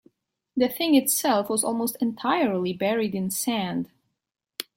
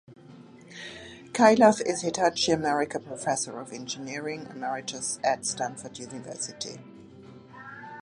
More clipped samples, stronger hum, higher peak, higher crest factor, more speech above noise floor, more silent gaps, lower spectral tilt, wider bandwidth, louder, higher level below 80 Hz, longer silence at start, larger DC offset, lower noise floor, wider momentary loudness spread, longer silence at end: neither; neither; second, -8 dBFS vs -4 dBFS; second, 18 dB vs 24 dB; first, 38 dB vs 22 dB; neither; about the same, -3.5 dB/octave vs -3.5 dB/octave; first, 16.5 kHz vs 11.5 kHz; first, -24 LUFS vs -27 LUFS; about the same, -68 dBFS vs -66 dBFS; first, 0.55 s vs 0.1 s; neither; first, -62 dBFS vs -49 dBFS; second, 12 LU vs 21 LU; first, 0.15 s vs 0 s